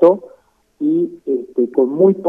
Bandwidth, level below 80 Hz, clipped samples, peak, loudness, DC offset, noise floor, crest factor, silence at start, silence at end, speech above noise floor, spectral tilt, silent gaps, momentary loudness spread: 3.7 kHz; -66 dBFS; under 0.1%; 0 dBFS; -17 LUFS; under 0.1%; -50 dBFS; 14 dB; 0 s; 0 s; 36 dB; -10.5 dB/octave; none; 9 LU